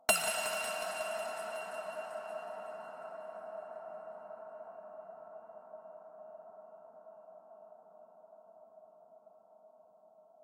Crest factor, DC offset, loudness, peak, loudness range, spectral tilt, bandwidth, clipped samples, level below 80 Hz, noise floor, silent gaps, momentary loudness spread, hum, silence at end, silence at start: 30 dB; under 0.1%; -40 LUFS; -12 dBFS; 18 LU; 0 dB/octave; 16.5 kHz; under 0.1%; -78 dBFS; -62 dBFS; none; 23 LU; none; 0 s; 0 s